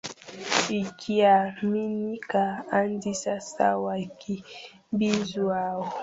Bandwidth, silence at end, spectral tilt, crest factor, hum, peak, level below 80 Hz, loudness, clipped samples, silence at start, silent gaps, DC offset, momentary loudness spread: 8 kHz; 0 s; -4.5 dB/octave; 22 dB; none; -4 dBFS; -66 dBFS; -26 LUFS; under 0.1%; 0.05 s; none; under 0.1%; 13 LU